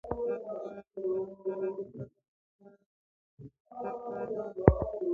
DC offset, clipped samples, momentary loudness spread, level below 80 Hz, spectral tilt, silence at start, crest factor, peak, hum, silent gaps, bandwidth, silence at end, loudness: under 0.1%; under 0.1%; 22 LU; -46 dBFS; -11 dB/octave; 0.05 s; 32 dB; -2 dBFS; none; 2.28-2.59 s, 2.86-3.37 s, 3.60-3.65 s; 3.8 kHz; 0 s; -34 LUFS